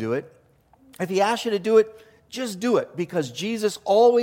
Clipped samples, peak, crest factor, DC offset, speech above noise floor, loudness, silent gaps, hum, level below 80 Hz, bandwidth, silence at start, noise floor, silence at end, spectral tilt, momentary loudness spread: under 0.1%; -6 dBFS; 16 dB; under 0.1%; 36 dB; -23 LUFS; none; none; -68 dBFS; 16.5 kHz; 0 s; -57 dBFS; 0 s; -5 dB/octave; 12 LU